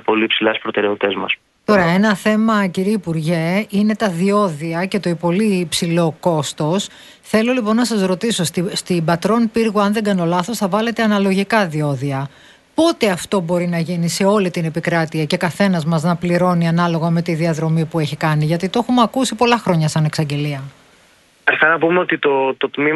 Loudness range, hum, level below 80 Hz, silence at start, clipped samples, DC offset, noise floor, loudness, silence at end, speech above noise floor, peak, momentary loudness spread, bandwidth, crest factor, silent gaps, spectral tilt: 1 LU; none; -54 dBFS; 0.1 s; under 0.1%; under 0.1%; -52 dBFS; -17 LUFS; 0 s; 35 dB; 0 dBFS; 5 LU; 12.5 kHz; 16 dB; none; -5.5 dB/octave